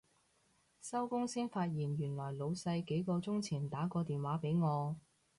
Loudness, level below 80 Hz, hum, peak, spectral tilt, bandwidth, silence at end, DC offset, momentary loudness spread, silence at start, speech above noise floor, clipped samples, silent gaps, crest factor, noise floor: -38 LUFS; -72 dBFS; none; -26 dBFS; -7 dB/octave; 11.5 kHz; 0.4 s; under 0.1%; 6 LU; 0.8 s; 37 dB; under 0.1%; none; 12 dB; -74 dBFS